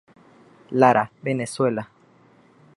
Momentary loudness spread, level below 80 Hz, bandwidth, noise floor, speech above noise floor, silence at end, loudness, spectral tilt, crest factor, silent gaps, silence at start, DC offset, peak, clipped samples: 13 LU; -66 dBFS; 11.5 kHz; -55 dBFS; 35 dB; 0.9 s; -22 LUFS; -6 dB/octave; 22 dB; none; 0.7 s; under 0.1%; -2 dBFS; under 0.1%